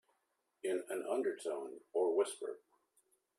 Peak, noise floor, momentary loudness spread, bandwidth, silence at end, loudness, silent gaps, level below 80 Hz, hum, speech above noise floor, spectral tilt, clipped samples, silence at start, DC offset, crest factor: -22 dBFS; -83 dBFS; 11 LU; 14 kHz; 0.8 s; -39 LUFS; none; under -90 dBFS; none; 45 dB; -3 dB/octave; under 0.1%; 0.65 s; under 0.1%; 18 dB